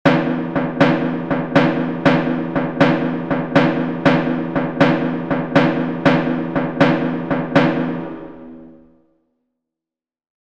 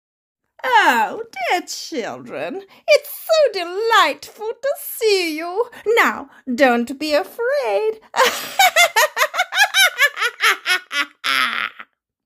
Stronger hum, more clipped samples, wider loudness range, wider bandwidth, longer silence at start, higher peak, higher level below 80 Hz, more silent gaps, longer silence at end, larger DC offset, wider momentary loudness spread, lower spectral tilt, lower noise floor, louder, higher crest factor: neither; neither; about the same, 4 LU vs 4 LU; second, 7.6 kHz vs 16 kHz; second, 0.05 s vs 0.65 s; about the same, 0 dBFS vs 0 dBFS; first, -50 dBFS vs -68 dBFS; neither; first, 1.75 s vs 0.45 s; first, 0.7% vs under 0.1%; second, 6 LU vs 14 LU; first, -7.5 dB/octave vs -0.5 dB/octave; first, -89 dBFS vs -44 dBFS; about the same, -17 LUFS vs -17 LUFS; about the same, 18 dB vs 18 dB